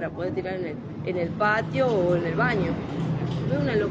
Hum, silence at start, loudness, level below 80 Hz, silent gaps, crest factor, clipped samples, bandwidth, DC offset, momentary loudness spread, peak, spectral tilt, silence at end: none; 0 s; -26 LUFS; -48 dBFS; none; 16 dB; under 0.1%; 7.6 kHz; under 0.1%; 8 LU; -10 dBFS; -8 dB/octave; 0 s